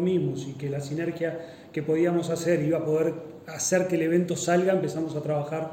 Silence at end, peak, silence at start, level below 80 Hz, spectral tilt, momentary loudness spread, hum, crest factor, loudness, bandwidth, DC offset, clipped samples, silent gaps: 0 s; -10 dBFS; 0 s; -66 dBFS; -5.5 dB/octave; 9 LU; none; 16 dB; -26 LUFS; 16.5 kHz; under 0.1%; under 0.1%; none